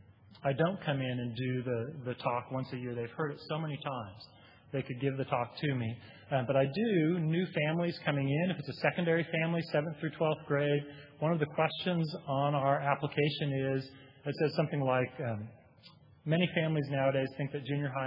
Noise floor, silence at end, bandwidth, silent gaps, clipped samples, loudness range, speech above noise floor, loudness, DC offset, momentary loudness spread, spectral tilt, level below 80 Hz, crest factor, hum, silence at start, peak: -59 dBFS; 0 s; 5.6 kHz; none; under 0.1%; 6 LU; 26 dB; -33 LUFS; under 0.1%; 9 LU; -5.5 dB/octave; -74 dBFS; 22 dB; none; 0.3 s; -12 dBFS